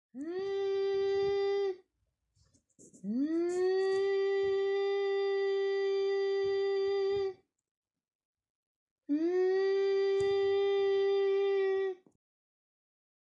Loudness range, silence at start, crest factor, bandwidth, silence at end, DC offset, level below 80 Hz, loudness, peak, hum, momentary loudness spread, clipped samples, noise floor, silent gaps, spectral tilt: 4 LU; 0.15 s; 10 dB; 8 kHz; 1.3 s; under 0.1%; -76 dBFS; -31 LUFS; -22 dBFS; none; 7 LU; under 0.1%; -81 dBFS; 7.71-7.83 s, 8.15-8.19 s, 8.25-8.34 s, 8.50-8.96 s; -5 dB/octave